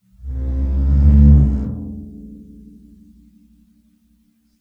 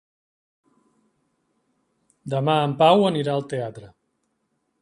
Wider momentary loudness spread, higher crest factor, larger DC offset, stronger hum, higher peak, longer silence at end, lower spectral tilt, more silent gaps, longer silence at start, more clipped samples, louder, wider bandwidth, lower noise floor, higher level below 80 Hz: first, 25 LU vs 15 LU; second, 16 dB vs 22 dB; neither; neither; about the same, -2 dBFS vs -2 dBFS; first, 2.2 s vs 0.95 s; first, -12 dB/octave vs -7 dB/octave; neither; second, 0.25 s vs 2.25 s; neither; first, -15 LUFS vs -21 LUFS; second, 1.9 kHz vs 11.5 kHz; second, -59 dBFS vs -73 dBFS; first, -18 dBFS vs -66 dBFS